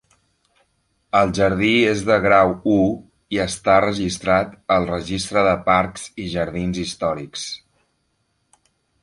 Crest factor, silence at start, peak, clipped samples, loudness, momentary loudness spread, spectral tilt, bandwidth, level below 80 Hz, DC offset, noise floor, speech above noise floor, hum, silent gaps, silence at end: 18 dB; 1.15 s; -2 dBFS; under 0.1%; -19 LUFS; 12 LU; -5 dB/octave; 11.5 kHz; -44 dBFS; under 0.1%; -69 dBFS; 50 dB; none; none; 1.45 s